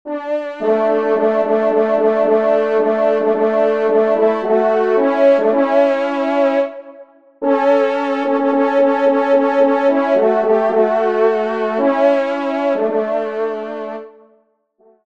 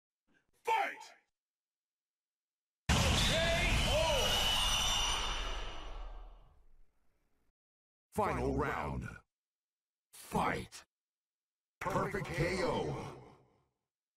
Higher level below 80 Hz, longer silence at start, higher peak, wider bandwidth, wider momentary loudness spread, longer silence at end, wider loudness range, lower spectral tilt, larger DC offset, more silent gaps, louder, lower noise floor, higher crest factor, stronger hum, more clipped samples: second, -66 dBFS vs -44 dBFS; second, 0.05 s vs 0.65 s; first, -2 dBFS vs -18 dBFS; second, 7.2 kHz vs 16 kHz; second, 7 LU vs 19 LU; about the same, 0.95 s vs 0.85 s; second, 2 LU vs 10 LU; first, -6.5 dB/octave vs -3 dB/octave; first, 0.3% vs under 0.1%; second, none vs 1.40-2.87 s, 7.50-8.10 s, 9.33-10.10 s, 10.91-11.81 s; first, -15 LUFS vs -34 LUFS; second, -58 dBFS vs under -90 dBFS; about the same, 14 dB vs 18 dB; neither; neither